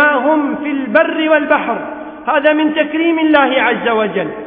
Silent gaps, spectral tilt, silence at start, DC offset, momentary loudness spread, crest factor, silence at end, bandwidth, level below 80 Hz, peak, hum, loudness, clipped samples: none; -8.5 dB/octave; 0 s; under 0.1%; 8 LU; 14 dB; 0 s; 4.4 kHz; -56 dBFS; 0 dBFS; none; -13 LUFS; under 0.1%